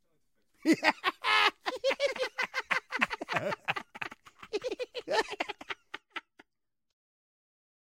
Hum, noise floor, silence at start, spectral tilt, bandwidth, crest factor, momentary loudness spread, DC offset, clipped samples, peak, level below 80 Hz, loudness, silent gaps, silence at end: none; -87 dBFS; 0.65 s; -3 dB/octave; 16.5 kHz; 28 dB; 15 LU; under 0.1%; under 0.1%; -6 dBFS; -74 dBFS; -31 LUFS; none; 1.7 s